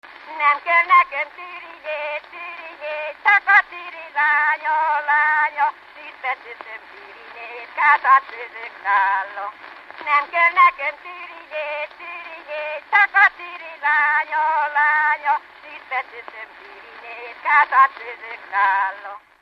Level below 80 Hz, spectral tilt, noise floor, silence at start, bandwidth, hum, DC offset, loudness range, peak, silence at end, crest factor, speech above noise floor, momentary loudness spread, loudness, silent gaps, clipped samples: -72 dBFS; -1.5 dB/octave; -40 dBFS; 0.05 s; 6.8 kHz; none; under 0.1%; 4 LU; -4 dBFS; 0.25 s; 16 dB; 21 dB; 21 LU; -18 LUFS; none; under 0.1%